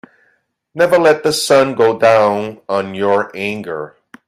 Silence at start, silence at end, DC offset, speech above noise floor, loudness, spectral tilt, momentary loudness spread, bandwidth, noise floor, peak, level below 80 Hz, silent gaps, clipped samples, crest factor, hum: 0.75 s; 0.4 s; under 0.1%; 47 dB; -14 LUFS; -4 dB/octave; 14 LU; 15.5 kHz; -61 dBFS; 0 dBFS; -60 dBFS; none; under 0.1%; 14 dB; none